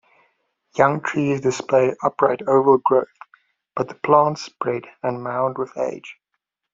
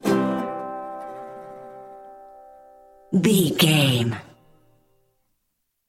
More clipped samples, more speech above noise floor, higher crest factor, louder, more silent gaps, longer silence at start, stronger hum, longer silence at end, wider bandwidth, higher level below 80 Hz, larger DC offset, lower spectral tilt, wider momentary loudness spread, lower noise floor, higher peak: neither; about the same, 58 dB vs 56 dB; about the same, 20 dB vs 22 dB; about the same, -20 LUFS vs -21 LUFS; neither; first, 0.75 s vs 0.05 s; neither; second, 0.6 s vs 1.65 s; second, 7.6 kHz vs 16.5 kHz; about the same, -64 dBFS vs -62 dBFS; neither; about the same, -6 dB/octave vs -5 dB/octave; second, 12 LU vs 24 LU; about the same, -78 dBFS vs -75 dBFS; about the same, -2 dBFS vs -4 dBFS